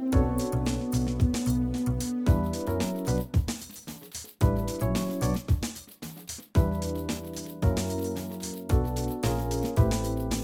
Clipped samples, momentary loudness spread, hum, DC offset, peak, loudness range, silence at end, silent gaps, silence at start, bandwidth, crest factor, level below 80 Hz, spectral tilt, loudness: under 0.1%; 12 LU; none; under 0.1%; -8 dBFS; 3 LU; 0 s; none; 0 s; 19.5 kHz; 20 dB; -34 dBFS; -6 dB/octave; -29 LUFS